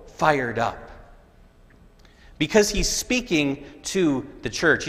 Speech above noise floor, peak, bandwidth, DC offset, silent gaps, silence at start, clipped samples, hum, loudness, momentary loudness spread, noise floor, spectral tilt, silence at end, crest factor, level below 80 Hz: 29 dB; -2 dBFS; 15.5 kHz; under 0.1%; none; 0 s; under 0.1%; none; -23 LUFS; 9 LU; -52 dBFS; -3.5 dB/octave; 0 s; 22 dB; -40 dBFS